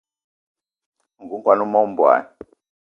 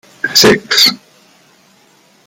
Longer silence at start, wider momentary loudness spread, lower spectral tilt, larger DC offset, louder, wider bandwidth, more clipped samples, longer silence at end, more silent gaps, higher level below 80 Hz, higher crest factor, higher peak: first, 1.2 s vs 0.25 s; about the same, 7 LU vs 6 LU; first, -8.5 dB/octave vs -2 dB/octave; neither; second, -18 LUFS vs -8 LUFS; second, 5.4 kHz vs 18 kHz; neither; second, 0.6 s vs 1.3 s; neither; second, -68 dBFS vs -50 dBFS; first, 20 dB vs 14 dB; about the same, 0 dBFS vs 0 dBFS